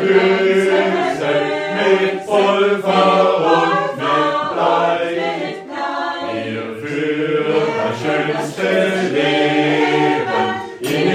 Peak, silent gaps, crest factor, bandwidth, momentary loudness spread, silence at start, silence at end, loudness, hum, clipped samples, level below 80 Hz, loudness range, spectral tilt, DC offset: -2 dBFS; none; 14 dB; 14.5 kHz; 9 LU; 0 s; 0 s; -16 LUFS; none; under 0.1%; -62 dBFS; 5 LU; -5.5 dB/octave; under 0.1%